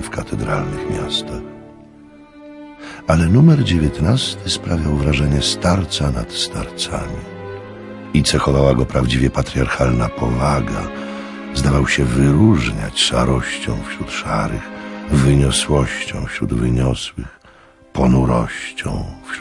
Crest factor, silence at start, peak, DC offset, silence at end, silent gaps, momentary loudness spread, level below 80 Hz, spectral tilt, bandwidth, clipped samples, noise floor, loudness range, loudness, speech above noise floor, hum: 16 dB; 0 s; 0 dBFS; under 0.1%; 0 s; none; 15 LU; -28 dBFS; -5.5 dB/octave; 11.5 kHz; under 0.1%; -46 dBFS; 4 LU; -17 LUFS; 30 dB; none